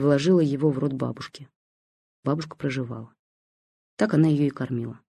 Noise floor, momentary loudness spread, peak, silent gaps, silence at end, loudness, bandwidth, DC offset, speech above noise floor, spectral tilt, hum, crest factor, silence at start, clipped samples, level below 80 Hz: under -90 dBFS; 14 LU; -8 dBFS; 1.56-2.23 s, 3.19-3.97 s; 0.1 s; -24 LUFS; 10.5 kHz; under 0.1%; over 66 dB; -7.5 dB/octave; none; 18 dB; 0 s; under 0.1%; -64 dBFS